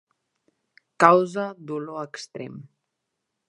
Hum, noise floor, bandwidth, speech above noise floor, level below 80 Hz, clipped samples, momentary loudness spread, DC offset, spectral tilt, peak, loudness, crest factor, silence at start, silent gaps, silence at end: none; -81 dBFS; 11.5 kHz; 58 dB; -80 dBFS; under 0.1%; 20 LU; under 0.1%; -5.5 dB/octave; 0 dBFS; -22 LUFS; 26 dB; 1 s; none; 0.85 s